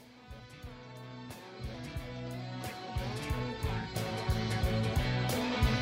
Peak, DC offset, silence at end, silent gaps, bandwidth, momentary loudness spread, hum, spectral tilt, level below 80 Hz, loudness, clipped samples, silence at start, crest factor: -18 dBFS; under 0.1%; 0 s; none; 16 kHz; 17 LU; none; -5.5 dB/octave; -42 dBFS; -35 LUFS; under 0.1%; 0 s; 18 dB